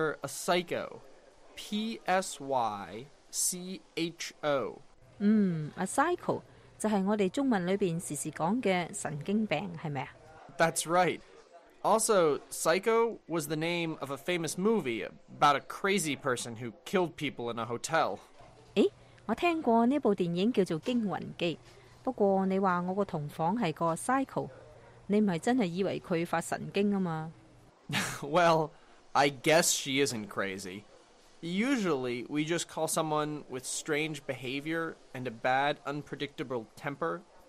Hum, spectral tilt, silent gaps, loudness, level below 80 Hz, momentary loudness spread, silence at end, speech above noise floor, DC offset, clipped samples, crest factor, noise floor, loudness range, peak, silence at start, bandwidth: none; -4.5 dB/octave; none; -31 LUFS; -66 dBFS; 12 LU; 0.25 s; 27 dB; under 0.1%; under 0.1%; 18 dB; -58 dBFS; 4 LU; -14 dBFS; 0 s; 15 kHz